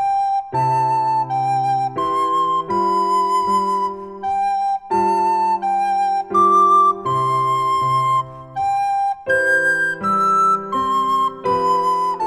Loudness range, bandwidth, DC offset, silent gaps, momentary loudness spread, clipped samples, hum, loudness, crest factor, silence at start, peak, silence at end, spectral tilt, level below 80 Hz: 3 LU; 13.5 kHz; under 0.1%; none; 6 LU; under 0.1%; none; -18 LUFS; 12 dB; 0 s; -6 dBFS; 0 s; -5 dB/octave; -56 dBFS